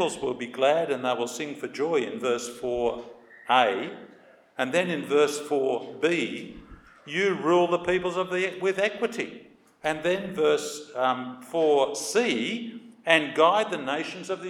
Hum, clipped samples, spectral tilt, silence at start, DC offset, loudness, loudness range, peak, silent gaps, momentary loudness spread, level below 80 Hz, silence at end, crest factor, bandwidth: none; under 0.1%; -4 dB/octave; 0 s; under 0.1%; -26 LUFS; 3 LU; -4 dBFS; none; 12 LU; -62 dBFS; 0 s; 22 dB; 15.5 kHz